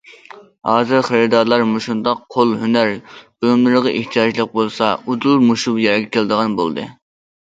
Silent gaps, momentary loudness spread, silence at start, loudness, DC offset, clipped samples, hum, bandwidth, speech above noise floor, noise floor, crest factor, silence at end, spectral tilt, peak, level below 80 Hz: none; 7 LU; 0.1 s; -16 LUFS; under 0.1%; under 0.1%; none; 7.8 kHz; 25 dB; -41 dBFS; 16 dB; 0.5 s; -5.5 dB/octave; 0 dBFS; -60 dBFS